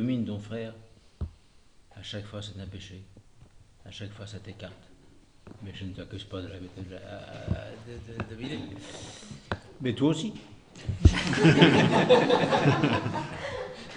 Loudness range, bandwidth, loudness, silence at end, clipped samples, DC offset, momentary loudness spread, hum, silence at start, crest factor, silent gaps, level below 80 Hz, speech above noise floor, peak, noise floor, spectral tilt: 21 LU; 10.5 kHz; -26 LUFS; 0 s; under 0.1%; under 0.1%; 22 LU; none; 0 s; 24 dB; none; -42 dBFS; 29 dB; -4 dBFS; -57 dBFS; -6 dB/octave